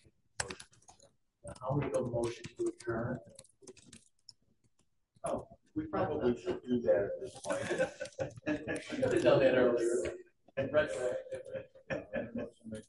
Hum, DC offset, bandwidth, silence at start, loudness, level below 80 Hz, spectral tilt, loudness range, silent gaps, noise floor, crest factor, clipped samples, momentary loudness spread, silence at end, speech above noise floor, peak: none; under 0.1%; 11.5 kHz; 0.4 s; -35 LUFS; -62 dBFS; -5.5 dB/octave; 10 LU; none; -77 dBFS; 22 dB; under 0.1%; 15 LU; 0.05 s; 43 dB; -14 dBFS